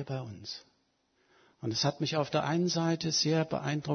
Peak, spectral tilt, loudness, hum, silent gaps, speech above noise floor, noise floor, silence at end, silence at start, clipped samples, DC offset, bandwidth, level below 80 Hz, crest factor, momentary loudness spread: -14 dBFS; -4.5 dB/octave; -31 LUFS; none; none; 42 dB; -74 dBFS; 0 s; 0 s; under 0.1%; under 0.1%; 6.6 kHz; -70 dBFS; 18 dB; 13 LU